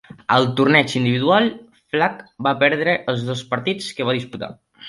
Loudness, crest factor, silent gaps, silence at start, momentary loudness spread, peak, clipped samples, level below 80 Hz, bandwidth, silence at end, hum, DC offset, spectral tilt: -19 LUFS; 18 dB; none; 0.3 s; 10 LU; -2 dBFS; under 0.1%; -60 dBFS; 11.5 kHz; 0 s; none; under 0.1%; -5.5 dB/octave